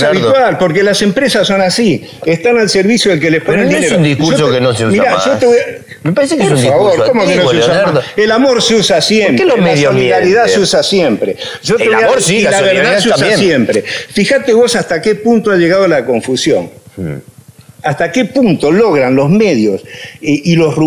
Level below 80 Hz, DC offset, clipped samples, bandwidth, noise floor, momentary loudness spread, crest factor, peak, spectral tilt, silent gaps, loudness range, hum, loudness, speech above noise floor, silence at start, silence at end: -46 dBFS; under 0.1%; under 0.1%; over 20 kHz; -38 dBFS; 7 LU; 10 dB; 0 dBFS; -4.5 dB/octave; none; 3 LU; none; -10 LUFS; 28 dB; 0 s; 0 s